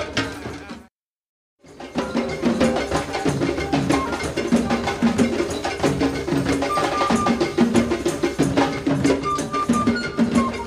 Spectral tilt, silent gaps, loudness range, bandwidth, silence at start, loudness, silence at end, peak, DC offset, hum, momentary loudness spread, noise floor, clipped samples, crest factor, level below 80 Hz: -5.5 dB/octave; 0.91-1.58 s; 4 LU; 15 kHz; 0 s; -21 LUFS; 0 s; -4 dBFS; under 0.1%; none; 6 LU; -53 dBFS; under 0.1%; 18 dB; -42 dBFS